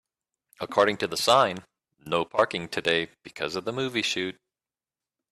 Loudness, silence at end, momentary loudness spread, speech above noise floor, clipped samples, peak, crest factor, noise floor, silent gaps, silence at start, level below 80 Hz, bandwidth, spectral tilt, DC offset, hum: -26 LUFS; 1 s; 13 LU; over 64 dB; under 0.1%; -6 dBFS; 22 dB; under -90 dBFS; none; 0.6 s; -66 dBFS; 14 kHz; -3.5 dB/octave; under 0.1%; none